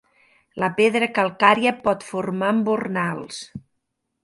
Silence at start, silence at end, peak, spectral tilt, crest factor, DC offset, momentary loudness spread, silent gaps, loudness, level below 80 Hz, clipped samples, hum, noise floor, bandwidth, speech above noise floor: 0.55 s; 0.65 s; 0 dBFS; -5.5 dB/octave; 22 dB; under 0.1%; 18 LU; none; -21 LUFS; -62 dBFS; under 0.1%; none; -76 dBFS; 11.5 kHz; 55 dB